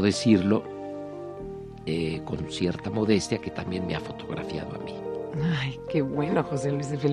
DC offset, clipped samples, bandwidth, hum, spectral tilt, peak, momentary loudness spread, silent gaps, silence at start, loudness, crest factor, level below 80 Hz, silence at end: under 0.1%; under 0.1%; 11 kHz; none; -6 dB/octave; -8 dBFS; 14 LU; none; 0 s; -28 LUFS; 20 dB; -52 dBFS; 0 s